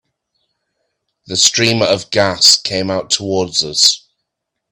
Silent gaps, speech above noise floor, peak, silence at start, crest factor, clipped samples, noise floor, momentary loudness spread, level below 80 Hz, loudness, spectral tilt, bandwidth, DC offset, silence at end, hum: none; 62 dB; 0 dBFS; 1.3 s; 16 dB; under 0.1%; -76 dBFS; 9 LU; -54 dBFS; -12 LUFS; -2 dB/octave; over 20 kHz; under 0.1%; 0.75 s; none